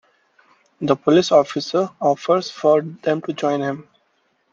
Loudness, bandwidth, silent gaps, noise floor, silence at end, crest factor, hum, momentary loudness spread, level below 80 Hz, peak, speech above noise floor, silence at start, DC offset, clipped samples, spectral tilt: -19 LUFS; 7.6 kHz; none; -65 dBFS; 0.7 s; 20 dB; none; 8 LU; -66 dBFS; 0 dBFS; 47 dB; 0.8 s; under 0.1%; under 0.1%; -5.5 dB/octave